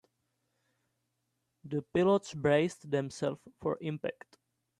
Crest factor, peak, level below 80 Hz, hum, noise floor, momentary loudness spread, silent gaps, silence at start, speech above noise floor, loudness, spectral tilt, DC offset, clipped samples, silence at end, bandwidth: 20 dB; -14 dBFS; -70 dBFS; none; -82 dBFS; 11 LU; none; 1.65 s; 50 dB; -32 LUFS; -6.5 dB/octave; under 0.1%; under 0.1%; 0.7 s; 11.5 kHz